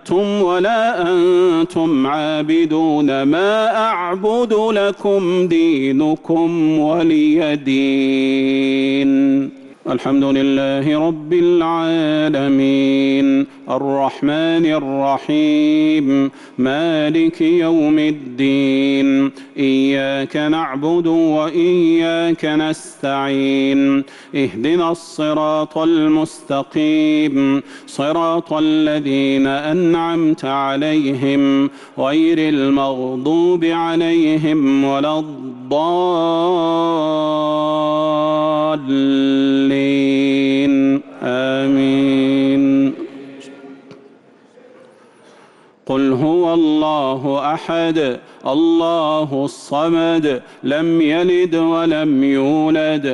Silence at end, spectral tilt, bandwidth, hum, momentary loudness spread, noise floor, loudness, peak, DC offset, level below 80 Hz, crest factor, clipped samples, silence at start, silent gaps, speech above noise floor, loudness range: 0 s; -6.5 dB/octave; 11 kHz; none; 6 LU; -47 dBFS; -16 LUFS; -6 dBFS; under 0.1%; -58 dBFS; 8 dB; under 0.1%; 0.05 s; none; 32 dB; 2 LU